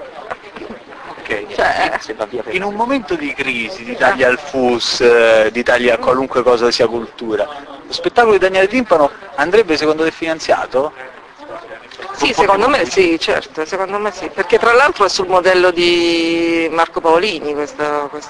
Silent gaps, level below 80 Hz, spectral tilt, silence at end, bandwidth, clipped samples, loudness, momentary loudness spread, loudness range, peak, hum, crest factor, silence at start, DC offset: none; -46 dBFS; -3.5 dB/octave; 0 s; 10.5 kHz; under 0.1%; -14 LUFS; 18 LU; 4 LU; 0 dBFS; none; 14 dB; 0 s; under 0.1%